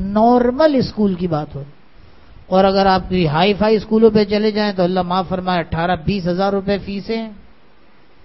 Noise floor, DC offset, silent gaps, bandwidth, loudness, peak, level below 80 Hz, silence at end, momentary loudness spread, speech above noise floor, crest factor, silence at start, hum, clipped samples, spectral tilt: -51 dBFS; 0.7%; none; 6 kHz; -16 LUFS; 0 dBFS; -40 dBFS; 0.9 s; 10 LU; 36 dB; 16 dB; 0 s; none; under 0.1%; -8.5 dB/octave